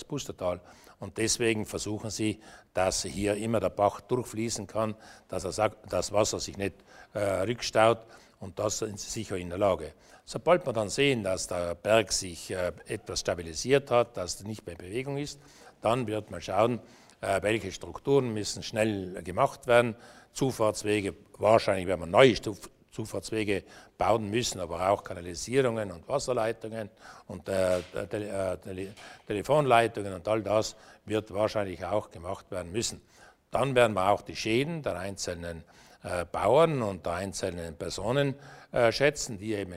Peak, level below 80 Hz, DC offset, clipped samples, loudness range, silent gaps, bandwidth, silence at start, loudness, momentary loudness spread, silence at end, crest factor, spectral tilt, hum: -4 dBFS; -56 dBFS; under 0.1%; under 0.1%; 4 LU; none; 16 kHz; 0 s; -29 LUFS; 14 LU; 0 s; 26 dB; -4.5 dB/octave; none